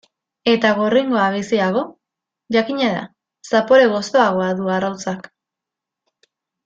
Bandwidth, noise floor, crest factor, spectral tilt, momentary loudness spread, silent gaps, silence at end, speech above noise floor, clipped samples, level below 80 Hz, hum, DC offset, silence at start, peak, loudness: 7.8 kHz; -85 dBFS; 18 dB; -5 dB/octave; 13 LU; none; 1.45 s; 68 dB; under 0.1%; -62 dBFS; none; under 0.1%; 0.45 s; -2 dBFS; -18 LUFS